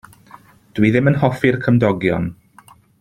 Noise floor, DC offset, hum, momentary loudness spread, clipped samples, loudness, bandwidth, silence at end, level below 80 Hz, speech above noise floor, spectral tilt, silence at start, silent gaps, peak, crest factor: -48 dBFS; under 0.1%; none; 9 LU; under 0.1%; -17 LUFS; 13.5 kHz; 0.7 s; -48 dBFS; 33 dB; -8.5 dB/octave; 0.75 s; none; 0 dBFS; 18 dB